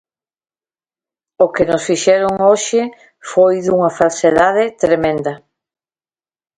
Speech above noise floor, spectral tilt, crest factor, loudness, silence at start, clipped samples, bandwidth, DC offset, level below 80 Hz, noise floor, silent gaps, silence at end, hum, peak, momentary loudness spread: over 77 dB; -4.5 dB/octave; 16 dB; -14 LUFS; 1.4 s; under 0.1%; 9.6 kHz; under 0.1%; -52 dBFS; under -90 dBFS; none; 1.2 s; none; 0 dBFS; 9 LU